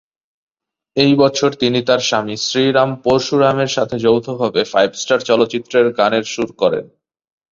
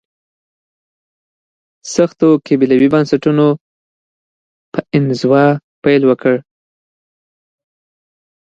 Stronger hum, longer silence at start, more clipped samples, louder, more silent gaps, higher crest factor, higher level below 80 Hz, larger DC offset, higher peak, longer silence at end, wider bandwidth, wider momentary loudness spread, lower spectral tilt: neither; second, 0.95 s vs 1.85 s; neither; about the same, -15 LUFS vs -13 LUFS; second, none vs 3.61-4.72 s, 5.64-5.82 s; about the same, 16 dB vs 16 dB; about the same, -54 dBFS vs -56 dBFS; neither; about the same, 0 dBFS vs 0 dBFS; second, 0.7 s vs 2.05 s; second, 7.6 kHz vs 9 kHz; second, 5 LU vs 9 LU; second, -4.5 dB/octave vs -7 dB/octave